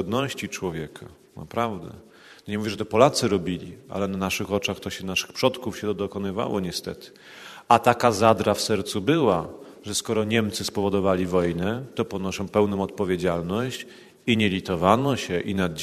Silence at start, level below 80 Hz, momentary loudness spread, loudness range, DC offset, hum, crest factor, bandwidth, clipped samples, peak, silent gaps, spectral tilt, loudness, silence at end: 0 s; -50 dBFS; 17 LU; 4 LU; under 0.1%; none; 24 dB; 13.5 kHz; under 0.1%; -2 dBFS; none; -5 dB/octave; -24 LUFS; 0 s